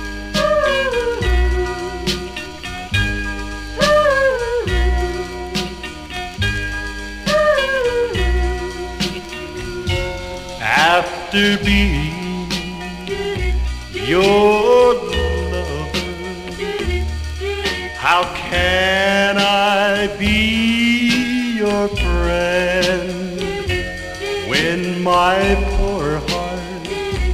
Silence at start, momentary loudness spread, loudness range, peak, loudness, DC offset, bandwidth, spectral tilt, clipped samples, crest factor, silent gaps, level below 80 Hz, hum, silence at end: 0 s; 12 LU; 5 LU; -2 dBFS; -18 LUFS; 0.2%; 15.5 kHz; -4.5 dB/octave; under 0.1%; 16 dB; none; -26 dBFS; none; 0 s